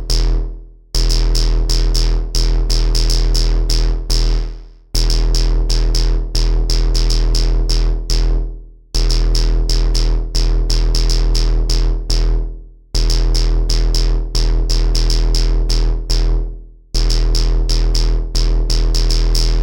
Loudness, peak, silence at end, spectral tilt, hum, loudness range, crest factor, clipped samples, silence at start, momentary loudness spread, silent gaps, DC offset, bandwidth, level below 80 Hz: -18 LUFS; -6 dBFS; 0 s; -4 dB/octave; none; 1 LU; 8 dB; under 0.1%; 0 s; 6 LU; none; under 0.1%; 16.5 kHz; -14 dBFS